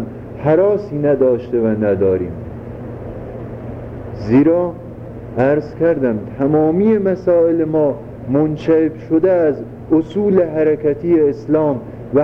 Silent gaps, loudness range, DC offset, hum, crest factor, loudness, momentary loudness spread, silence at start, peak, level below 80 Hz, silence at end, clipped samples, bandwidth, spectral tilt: none; 4 LU; under 0.1%; none; 14 dB; -16 LUFS; 16 LU; 0 s; -2 dBFS; -42 dBFS; 0 s; under 0.1%; 6.2 kHz; -10.5 dB/octave